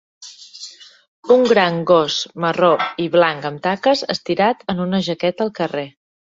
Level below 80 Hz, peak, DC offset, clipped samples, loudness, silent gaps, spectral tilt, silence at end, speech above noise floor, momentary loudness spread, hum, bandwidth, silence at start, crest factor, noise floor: -60 dBFS; -2 dBFS; under 0.1%; under 0.1%; -17 LUFS; 1.08-1.23 s; -5 dB/octave; 0.5 s; 22 dB; 20 LU; none; 7.8 kHz; 0.2 s; 16 dB; -39 dBFS